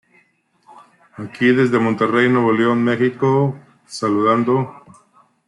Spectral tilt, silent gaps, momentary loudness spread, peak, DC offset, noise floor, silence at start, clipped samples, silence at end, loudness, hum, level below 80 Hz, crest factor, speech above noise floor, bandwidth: -7 dB/octave; none; 16 LU; -4 dBFS; under 0.1%; -59 dBFS; 0.75 s; under 0.1%; 0.75 s; -17 LUFS; none; -64 dBFS; 14 dB; 43 dB; 11 kHz